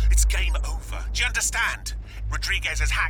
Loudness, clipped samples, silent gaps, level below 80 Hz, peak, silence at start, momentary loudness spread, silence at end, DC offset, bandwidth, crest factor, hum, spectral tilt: -25 LUFS; under 0.1%; none; -26 dBFS; -8 dBFS; 0 s; 11 LU; 0 s; under 0.1%; 17.5 kHz; 16 dB; none; -1.5 dB/octave